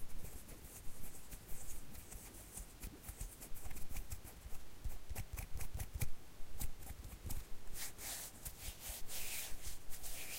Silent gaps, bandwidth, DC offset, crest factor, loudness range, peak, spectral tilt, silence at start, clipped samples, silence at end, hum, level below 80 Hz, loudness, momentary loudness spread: none; 16 kHz; under 0.1%; 16 dB; 5 LU; -26 dBFS; -2.5 dB/octave; 0 s; under 0.1%; 0 s; none; -50 dBFS; -50 LUFS; 9 LU